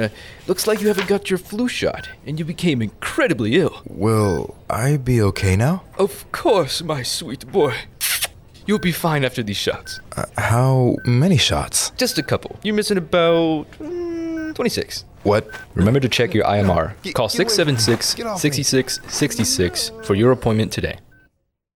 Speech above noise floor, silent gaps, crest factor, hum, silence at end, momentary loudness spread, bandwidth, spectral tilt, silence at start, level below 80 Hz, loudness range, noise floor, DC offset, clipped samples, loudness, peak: 46 dB; none; 14 dB; none; 0.75 s; 10 LU; over 20 kHz; -4.5 dB/octave; 0 s; -44 dBFS; 3 LU; -65 dBFS; 0.1%; under 0.1%; -19 LUFS; -6 dBFS